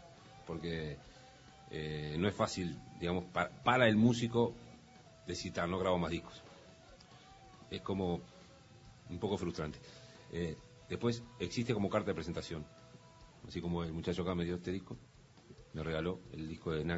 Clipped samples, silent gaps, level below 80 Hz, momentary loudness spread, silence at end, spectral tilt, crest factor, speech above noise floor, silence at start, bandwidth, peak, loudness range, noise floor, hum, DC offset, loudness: under 0.1%; none; -60 dBFS; 24 LU; 0 s; -5 dB/octave; 26 dB; 23 dB; 0 s; 7.6 kHz; -14 dBFS; 9 LU; -59 dBFS; none; under 0.1%; -37 LUFS